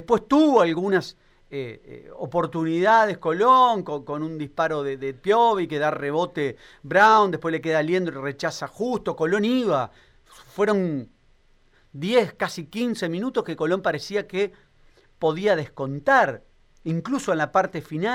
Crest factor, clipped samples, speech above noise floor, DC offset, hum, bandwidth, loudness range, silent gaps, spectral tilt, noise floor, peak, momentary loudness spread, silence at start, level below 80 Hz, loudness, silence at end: 18 dB; under 0.1%; 36 dB; under 0.1%; none; 16 kHz; 5 LU; none; -5.5 dB/octave; -58 dBFS; -6 dBFS; 13 LU; 0 s; -58 dBFS; -22 LUFS; 0 s